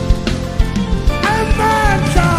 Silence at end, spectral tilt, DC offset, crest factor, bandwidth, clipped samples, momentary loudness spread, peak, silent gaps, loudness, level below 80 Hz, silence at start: 0 s; -5.5 dB/octave; under 0.1%; 14 dB; 15.5 kHz; under 0.1%; 5 LU; 0 dBFS; none; -15 LUFS; -18 dBFS; 0 s